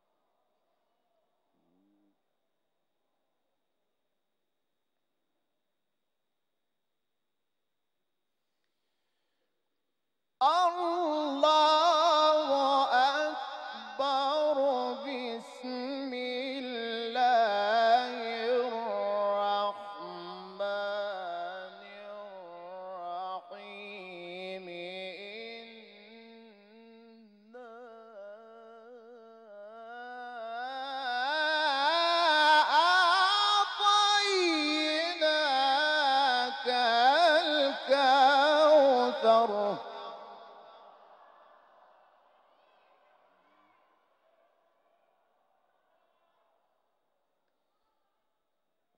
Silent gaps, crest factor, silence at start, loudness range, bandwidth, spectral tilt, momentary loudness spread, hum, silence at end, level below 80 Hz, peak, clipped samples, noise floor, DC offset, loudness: none; 20 dB; 10.4 s; 18 LU; 11 kHz; -2 dB/octave; 21 LU; none; 8.35 s; -90 dBFS; -12 dBFS; under 0.1%; -88 dBFS; under 0.1%; -27 LUFS